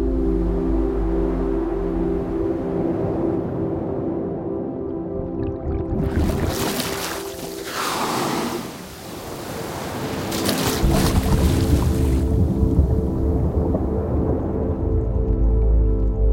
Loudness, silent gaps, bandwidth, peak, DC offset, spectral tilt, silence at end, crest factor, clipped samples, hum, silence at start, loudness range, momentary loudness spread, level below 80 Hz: -22 LUFS; none; 16.5 kHz; -2 dBFS; under 0.1%; -6 dB/octave; 0 s; 18 dB; under 0.1%; none; 0 s; 5 LU; 9 LU; -26 dBFS